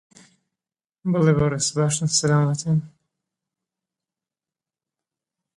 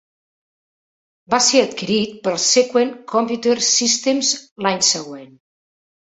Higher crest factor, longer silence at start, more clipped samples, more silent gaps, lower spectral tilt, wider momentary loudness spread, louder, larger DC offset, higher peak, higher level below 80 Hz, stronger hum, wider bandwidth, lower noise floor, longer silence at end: about the same, 18 dB vs 18 dB; second, 1.05 s vs 1.3 s; neither; second, none vs 4.51-4.56 s; first, -5 dB/octave vs -2 dB/octave; about the same, 7 LU vs 7 LU; second, -21 LUFS vs -17 LUFS; neither; second, -6 dBFS vs -2 dBFS; first, -54 dBFS vs -64 dBFS; neither; first, 11.5 kHz vs 8.2 kHz; about the same, under -90 dBFS vs under -90 dBFS; first, 2.7 s vs 0.75 s